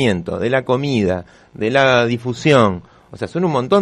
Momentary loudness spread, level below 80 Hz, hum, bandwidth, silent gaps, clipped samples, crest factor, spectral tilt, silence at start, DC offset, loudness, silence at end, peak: 12 LU; -52 dBFS; none; 10.5 kHz; none; under 0.1%; 16 dB; -6 dB/octave; 0 s; under 0.1%; -17 LUFS; 0 s; 0 dBFS